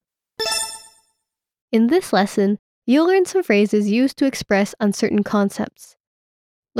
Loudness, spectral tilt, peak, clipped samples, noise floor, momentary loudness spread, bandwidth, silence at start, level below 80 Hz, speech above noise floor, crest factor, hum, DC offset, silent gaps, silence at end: -19 LUFS; -5 dB/octave; -4 dBFS; under 0.1%; -79 dBFS; 9 LU; 15.5 kHz; 0.4 s; -58 dBFS; 61 dB; 16 dB; none; under 0.1%; 1.61-1.68 s, 2.59-2.82 s, 6.00-6.63 s; 0 s